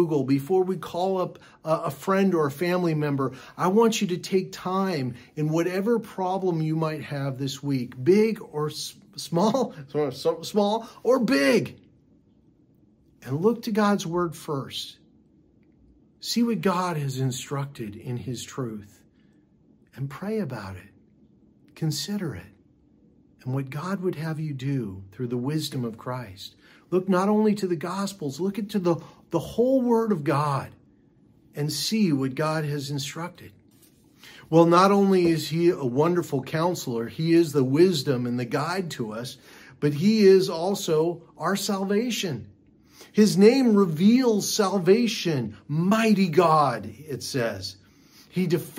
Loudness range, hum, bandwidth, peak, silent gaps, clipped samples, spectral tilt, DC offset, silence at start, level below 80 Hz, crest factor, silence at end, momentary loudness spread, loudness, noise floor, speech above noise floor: 10 LU; none; 16 kHz; -4 dBFS; none; under 0.1%; -6 dB/octave; under 0.1%; 0 s; -66 dBFS; 20 dB; 0 s; 14 LU; -24 LUFS; -60 dBFS; 36 dB